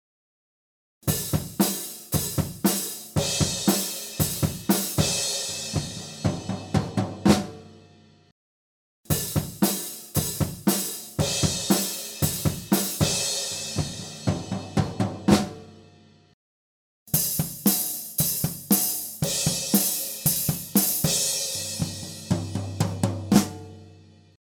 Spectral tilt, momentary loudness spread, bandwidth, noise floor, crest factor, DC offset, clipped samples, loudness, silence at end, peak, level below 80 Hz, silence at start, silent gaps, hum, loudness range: -4 dB/octave; 8 LU; over 20 kHz; -54 dBFS; 22 dB; under 0.1%; under 0.1%; -25 LUFS; 0.5 s; -4 dBFS; -48 dBFS; 1.05 s; 8.32-9.04 s, 16.33-17.06 s; none; 5 LU